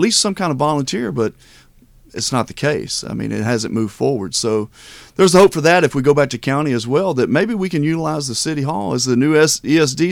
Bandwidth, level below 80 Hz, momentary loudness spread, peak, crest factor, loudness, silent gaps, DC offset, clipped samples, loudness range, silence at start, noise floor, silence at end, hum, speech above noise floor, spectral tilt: 17 kHz; -48 dBFS; 9 LU; -2 dBFS; 14 dB; -16 LUFS; none; under 0.1%; under 0.1%; 6 LU; 0 s; -48 dBFS; 0 s; none; 31 dB; -4.5 dB/octave